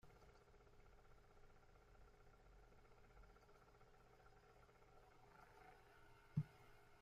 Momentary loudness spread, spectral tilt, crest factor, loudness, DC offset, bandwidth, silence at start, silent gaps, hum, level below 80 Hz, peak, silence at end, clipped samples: 20 LU; -7.5 dB/octave; 28 dB; -52 LUFS; under 0.1%; 15 kHz; 0.05 s; none; none; -72 dBFS; -32 dBFS; 0 s; under 0.1%